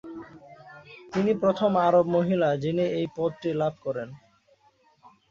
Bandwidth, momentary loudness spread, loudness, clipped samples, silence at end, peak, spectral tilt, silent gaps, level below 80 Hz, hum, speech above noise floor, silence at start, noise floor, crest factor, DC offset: 7.4 kHz; 21 LU; -25 LUFS; under 0.1%; 1.15 s; -10 dBFS; -8 dB/octave; none; -64 dBFS; none; 38 dB; 0.05 s; -63 dBFS; 18 dB; under 0.1%